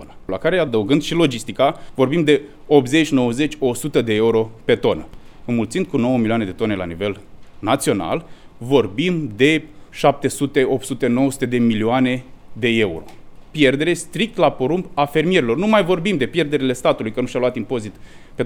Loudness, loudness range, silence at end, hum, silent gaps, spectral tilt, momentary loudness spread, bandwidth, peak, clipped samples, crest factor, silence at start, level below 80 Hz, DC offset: -19 LUFS; 4 LU; 0 s; none; none; -5.5 dB/octave; 9 LU; 17.5 kHz; 0 dBFS; under 0.1%; 18 dB; 0 s; -44 dBFS; under 0.1%